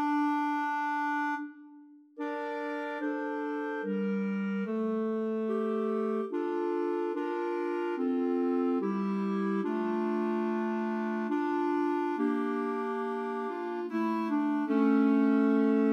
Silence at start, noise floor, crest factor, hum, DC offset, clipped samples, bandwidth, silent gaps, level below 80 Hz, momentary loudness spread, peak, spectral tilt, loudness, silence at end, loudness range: 0 s; -54 dBFS; 14 dB; none; under 0.1%; under 0.1%; 6.8 kHz; none; under -90 dBFS; 8 LU; -16 dBFS; -8 dB/octave; -31 LUFS; 0 s; 4 LU